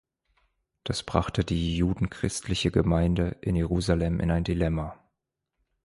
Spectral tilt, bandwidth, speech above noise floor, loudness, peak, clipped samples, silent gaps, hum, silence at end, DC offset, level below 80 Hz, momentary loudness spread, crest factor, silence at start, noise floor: -6 dB/octave; 11.5 kHz; 57 dB; -27 LUFS; -6 dBFS; under 0.1%; none; none; 0.9 s; under 0.1%; -38 dBFS; 8 LU; 22 dB; 0.85 s; -83 dBFS